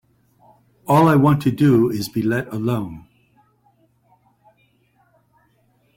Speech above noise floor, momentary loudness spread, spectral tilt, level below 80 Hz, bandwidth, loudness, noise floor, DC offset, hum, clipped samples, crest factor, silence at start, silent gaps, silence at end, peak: 45 dB; 16 LU; -7.5 dB/octave; -54 dBFS; 16.5 kHz; -18 LUFS; -61 dBFS; under 0.1%; none; under 0.1%; 18 dB; 0.9 s; none; 3 s; -4 dBFS